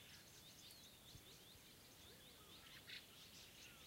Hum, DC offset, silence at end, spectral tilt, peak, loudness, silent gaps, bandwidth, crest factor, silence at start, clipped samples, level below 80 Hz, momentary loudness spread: none; under 0.1%; 0 s; -2 dB/octave; -42 dBFS; -60 LUFS; none; 16 kHz; 20 dB; 0 s; under 0.1%; -78 dBFS; 6 LU